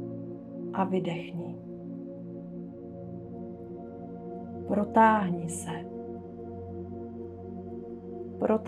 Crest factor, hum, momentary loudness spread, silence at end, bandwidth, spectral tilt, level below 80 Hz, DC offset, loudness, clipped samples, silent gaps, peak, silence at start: 24 dB; none; 15 LU; 0 s; 13 kHz; -6.5 dB/octave; -66 dBFS; under 0.1%; -33 LUFS; under 0.1%; none; -8 dBFS; 0 s